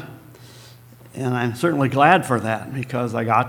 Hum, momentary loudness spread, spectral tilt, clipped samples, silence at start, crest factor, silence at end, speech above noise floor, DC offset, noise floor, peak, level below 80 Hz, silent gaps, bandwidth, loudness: none; 13 LU; -6.5 dB/octave; under 0.1%; 0 s; 22 dB; 0 s; 26 dB; under 0.1%; -45 dBFS; 0 dBFS; -62 dBFS; none; 19 kHz; -20 LUFS